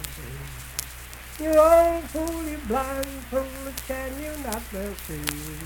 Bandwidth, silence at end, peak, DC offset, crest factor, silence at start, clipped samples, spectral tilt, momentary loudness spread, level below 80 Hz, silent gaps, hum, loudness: 19 kHz; 0 s; -2 dBFS; under 0.1%; 22 dB; 0 s; under 0.1%; -4.5 dB/octave; 18 LU; -40 dBFS; none; none; -25 LUFS